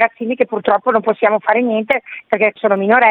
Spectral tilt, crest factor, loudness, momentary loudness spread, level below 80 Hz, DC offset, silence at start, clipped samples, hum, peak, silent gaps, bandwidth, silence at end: -8 dB/octave; 14 dB; -15 LUFS; 6 LU; -60 dBFS; under 0.1%; 0 s; under 0.1%; none; 0 dBFS; none; 4.3 kHz; 0 s